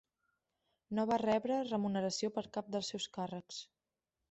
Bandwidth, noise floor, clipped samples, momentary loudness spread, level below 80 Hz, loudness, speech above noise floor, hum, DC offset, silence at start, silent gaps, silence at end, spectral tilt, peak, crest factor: 8.2 kHz; under -90 dBFS; under 0.1%; 10 LU; -74 dBFS; -37 LUFS; over 53 dB; none; under 0.1%; 0.9 s; none; 0.65 s; -5 dB/octave; -22 dBFS; 18 dB